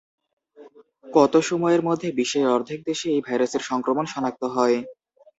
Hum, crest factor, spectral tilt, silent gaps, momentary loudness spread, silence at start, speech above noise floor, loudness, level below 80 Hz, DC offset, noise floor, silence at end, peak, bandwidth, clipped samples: none; 20 dB; -5 dB/octave; none; 8 LU; 0.6 s; 27 dB; -22 LUFS; -68 dBFS; under 0.1%; -49 dBFS; 0.45 s; -4 dBFS; 8 kHz; under 0.1%